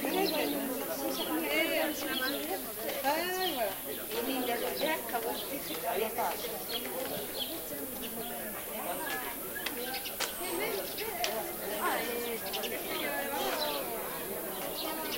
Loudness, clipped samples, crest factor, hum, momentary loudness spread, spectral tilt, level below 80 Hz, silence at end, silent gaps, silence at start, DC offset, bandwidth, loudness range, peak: -33 LUFS; under 0.1%; 24 dB; none; 6 LU; -2 dB/octave; -62 dBFS; 0 s; none; 0 s; under 0.1%; 16 kHz; 4 LU; -12 dBFS